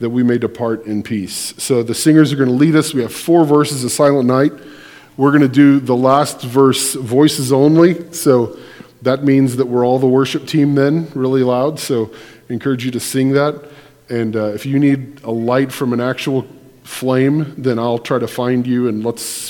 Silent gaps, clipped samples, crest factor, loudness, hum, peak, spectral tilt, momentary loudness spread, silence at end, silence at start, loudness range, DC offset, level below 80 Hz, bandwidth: none; under 0.1%; 14 dB; -15 LUFS; none; 0 dBFS; -6 dB/octave; 10 LU; 0 s; 0 s; 5 LU; under 0.1%; -58 dBFS; 18.5 kHz